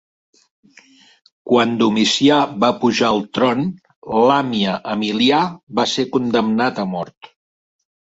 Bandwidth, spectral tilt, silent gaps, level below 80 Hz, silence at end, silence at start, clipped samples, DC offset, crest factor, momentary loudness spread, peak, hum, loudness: 8 kHz; -4.5 dB/octave; 3.96-4.02 s, 5.63-5.67 s, 7.17-7.21 s; -60 dBFS; 0.75 s; 1.45 s; under 0.1%; under 0.1%; 16 dB; 9 LU; -2 dBFS; none; -17 LUFS